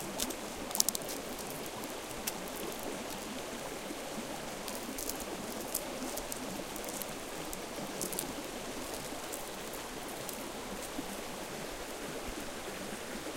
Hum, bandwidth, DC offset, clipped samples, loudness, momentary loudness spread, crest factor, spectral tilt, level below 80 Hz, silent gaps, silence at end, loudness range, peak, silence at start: none; 17 kHz; under 0.1%; under 0.1%; -39 LUFS; 4 LU; 38 dB; -2 dB/octave; -56 dBFS; none; 0 s; 4 LU; -2 dBFS; 0 s